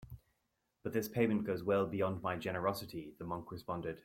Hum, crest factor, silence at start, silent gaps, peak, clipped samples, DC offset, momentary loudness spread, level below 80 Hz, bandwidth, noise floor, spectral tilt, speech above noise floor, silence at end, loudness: none; 20 dB; 0 s; none; -18 dBFS; under 0.1%; under 0.1%; 13 LU; -66 dBFS; 16.5 kHz; -83 dBFS; -6.5 dB/octave; 46 dB; 0.05 s; -38 LUFS